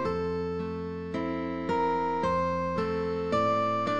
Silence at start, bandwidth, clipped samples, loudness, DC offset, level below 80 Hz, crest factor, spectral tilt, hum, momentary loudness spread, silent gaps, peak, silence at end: 0 s; 9.4 kHz; under 0.1%; -29 LUFS; 0.3%; -54 dBFS; 14 dB; -7 dB/octave; none; 7 LU; none; -16 dBFS; 0 s